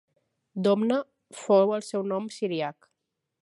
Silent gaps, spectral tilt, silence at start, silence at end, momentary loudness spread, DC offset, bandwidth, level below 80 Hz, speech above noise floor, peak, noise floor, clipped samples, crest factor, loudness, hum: none; -6 dB/octave; 0.55 s; 0.7 s; 16 LU; under 0.1%; 11.5 kHz; -82 dBFS; 56 dB; -8 dBFS; -81 dBFS; under 0.1%; 18 dB; -26 LUFS; none